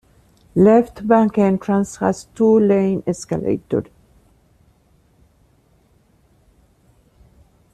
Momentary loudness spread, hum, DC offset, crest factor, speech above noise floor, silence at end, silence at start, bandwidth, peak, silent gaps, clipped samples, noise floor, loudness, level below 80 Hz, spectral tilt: 10 LU; none; under 0.1%; 16 dB; 41 dB; 3.9 s; 0.55 s; 11.5 kHz; -2 dBFS; none; under 0.1%; -57 dBFS; -17 LUFS; -52 dBFS; -7.5 dB/octave